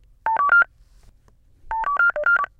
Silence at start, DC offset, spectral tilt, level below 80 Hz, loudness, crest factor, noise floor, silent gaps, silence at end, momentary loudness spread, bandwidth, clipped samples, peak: 0.25 s; under 0.1%; -4 dB/octave; -50 dBFS; -19 LUFS; 16 dB; -55 dBFS; none; 0.15 s; 10 LU; 4.7 kHz; under 0.1%; -6 dBFS